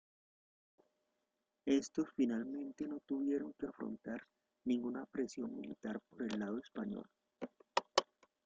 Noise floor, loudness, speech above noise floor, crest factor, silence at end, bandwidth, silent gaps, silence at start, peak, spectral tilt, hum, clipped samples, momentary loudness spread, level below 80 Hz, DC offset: -87 dBFS; -41 LUFS; 47 dB; 28 dB; 0.4 s; 9 kHz; none; 1.65 s; -14 dBFS; -4.5 dB/octave; none; under 0.1%; 11 LU; -78 dBFS; under 0.1%